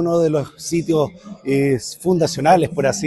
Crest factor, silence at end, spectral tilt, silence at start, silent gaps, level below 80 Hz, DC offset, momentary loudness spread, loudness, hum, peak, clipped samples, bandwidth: 16 dB; 0 s; -5.5 dB/octave; 0 s; none; -52 dBFS; under 0.1%; 8 LU; -18 LUFS; none; -2 dBFS; under 0.1%; 12.5 kHz